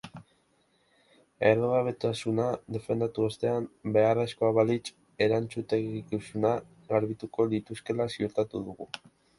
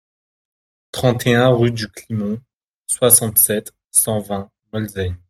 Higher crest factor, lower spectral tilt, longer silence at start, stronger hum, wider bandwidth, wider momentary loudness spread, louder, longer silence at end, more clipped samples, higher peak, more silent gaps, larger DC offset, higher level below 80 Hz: about the same, 22 dB vs 20 dB; first, -6.5 dB/octave vs -4 dB/octave; second, 0.05 s vs 0.95 s; neither; second, 11.5 kHz vs 16 kHz; second, 10 LU vs 16 LU; second, -29 LUFS vs -16 LUFS; first, 0.4 s vs 0.15 s; neither; second, -8 dBFS vs 0 dBFS; second, none vs 2.53-2.85 s; neither; second, -64 dBFS vs -52 dBFS